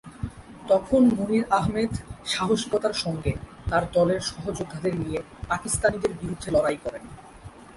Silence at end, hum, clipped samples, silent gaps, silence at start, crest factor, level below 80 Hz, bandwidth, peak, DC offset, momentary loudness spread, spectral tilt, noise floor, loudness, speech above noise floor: 0 s; none; under 0.1%; none; 0.05 s; 18 dB; -44 dBFS; 11.5 kHz; -8 dBFS; under 0.1%; 16 LU; -5 dB/octave; -45 dBFS; -25 LUFS; 20 dB